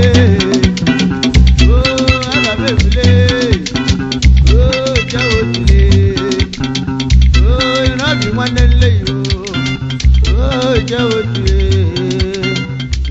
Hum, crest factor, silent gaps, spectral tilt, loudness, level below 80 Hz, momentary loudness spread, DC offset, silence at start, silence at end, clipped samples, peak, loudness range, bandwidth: none; 10 dB; none; -5.5 dB/octave; -12 LUFS; -14 dBFS; 7 LU; under 0.1%; 0 s; 0 s; under 0.1%; 0 dBFS; 3 LU; 8 kHz